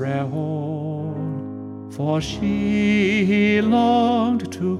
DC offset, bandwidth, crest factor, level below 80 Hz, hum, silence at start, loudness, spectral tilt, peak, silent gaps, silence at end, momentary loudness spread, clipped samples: under 0.1%; 11 kHz; 14 dB; -48 dBFS; none; 0 s; -20 LUFS; -7 dB/octave; -8 dBFS; none; 0 s; 11 LU; under 0.1%